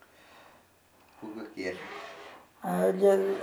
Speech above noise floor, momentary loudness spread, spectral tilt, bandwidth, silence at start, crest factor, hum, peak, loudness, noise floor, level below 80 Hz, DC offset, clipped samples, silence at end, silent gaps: 34 dB; 23 LU; -6.5 dB/octave; 17.5 kHz; 1.2 s; 20 dB; none; -12 dBFS; -29 LUFS; -62 dBFS; -78 dBFS; under 0.1%; under 0.1%; 0 s; none